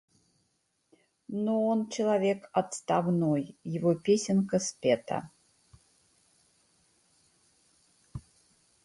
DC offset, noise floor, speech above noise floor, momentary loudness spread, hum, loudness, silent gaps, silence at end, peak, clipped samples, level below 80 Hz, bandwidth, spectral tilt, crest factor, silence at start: under 0.1%; -76 dBFS; 47 dB; 12 LU; none; -29 LUFS; none; 0.65 s; -12 dBFS; under 0.1%; -66 dBFS; 11.5 kHz; -6 dB/octave; 20 dB; 1.3 s